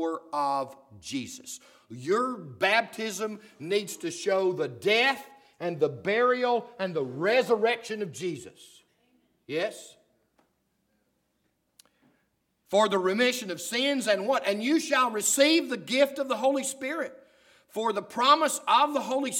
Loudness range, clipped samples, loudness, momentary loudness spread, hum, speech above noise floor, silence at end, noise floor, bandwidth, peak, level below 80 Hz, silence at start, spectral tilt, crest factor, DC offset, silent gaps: 13 LU; under 0.1%; -27 LUFS; 13 LU; none; 48 dB; 0 s; -75 dBFS; 18.5 kHz; -8 dBFS; -80 dBFS; 0 s; -3 dB/octave; 20 dB; under 0.1%; none